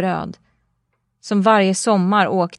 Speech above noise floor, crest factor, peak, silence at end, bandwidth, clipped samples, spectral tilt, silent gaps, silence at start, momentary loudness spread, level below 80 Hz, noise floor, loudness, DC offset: 53 dB; 16 dB; -2 dBFS; 0.05 s; 11.5 kHz; under 0.1%; -5 dB/octave; none; 0 s; 10 LU; -60 dBFS; -70 dBFS; -17 LUFS; under 0.1%